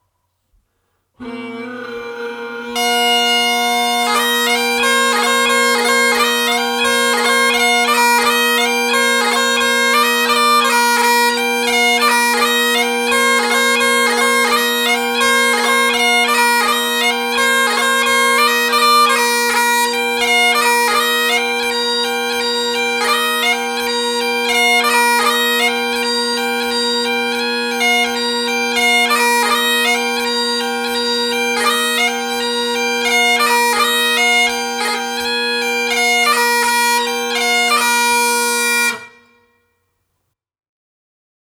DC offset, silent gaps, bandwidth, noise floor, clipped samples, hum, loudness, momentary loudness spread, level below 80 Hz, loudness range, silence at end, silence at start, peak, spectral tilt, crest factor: under 0.1%; none; over 20 kHz; -72 dBFS; under 0.1%; none; -13 LUFS; 5 LU; -60 dBFS; 3 LU; 2.5 s; 1.2 s; 0 dBFS; 0 dB/octave; 14 dB